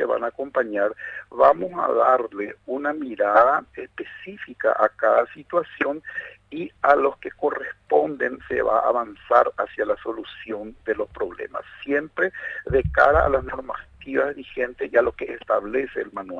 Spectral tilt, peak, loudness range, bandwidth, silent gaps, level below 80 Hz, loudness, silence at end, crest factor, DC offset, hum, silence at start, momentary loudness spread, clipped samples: -7.5 dB/octave; -2 dBFS; 4 LU; 7 kHz; none; -44 dBFS; -22 LUFS; 0 s; 20 dB; under 0.1%; none; 0 s; 16 LU; under 0.1%